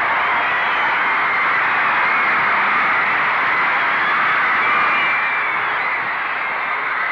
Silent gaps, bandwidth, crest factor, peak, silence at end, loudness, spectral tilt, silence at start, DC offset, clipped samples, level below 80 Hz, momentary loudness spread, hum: none; 7.8 kHz; 10 dB; -8 dBFS; 0 s; -16 LUFS; -4 dB/octave; 0 s; under 0.1%; under 0.1%; -60 dBFS; 5 LU; none